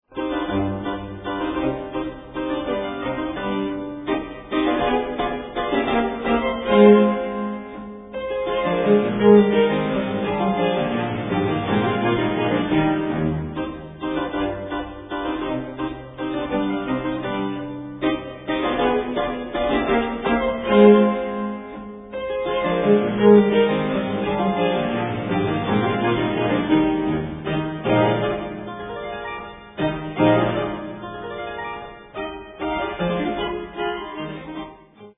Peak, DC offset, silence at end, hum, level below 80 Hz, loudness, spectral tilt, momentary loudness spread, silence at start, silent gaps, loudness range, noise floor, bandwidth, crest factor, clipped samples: -2 dBFS; under 0.1%; 0.05 s; none; -44 dBFS; -22 LUFS; -10.5 dB/octave; 15 LU; 0.1 s; none; 7 LU; -44 dBFS; 3.9 kHz; 20 dB; under 0.1%